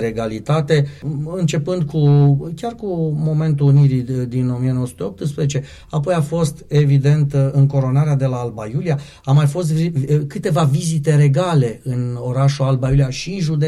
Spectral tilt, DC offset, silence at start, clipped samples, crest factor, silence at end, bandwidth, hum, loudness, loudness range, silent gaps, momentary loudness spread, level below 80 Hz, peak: -7.5 dB/octave; under 0.1%; 0 s; under 0.1%; 12 dB; 0 s; 11.5 kHz; none; -17 LUFS; 2 LU; none; 9 LU; -42 dBFS; -4 dBFS